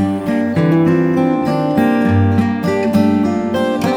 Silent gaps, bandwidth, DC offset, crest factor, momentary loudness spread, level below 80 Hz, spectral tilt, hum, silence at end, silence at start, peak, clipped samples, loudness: none; 16.5 kHz; under 0.1%; 12 dB; 4 LU; -48 dBFS; -8 dB/octave; none; 0 s; 0 s; -2 dBFS; under 0.1%; -14 LUFS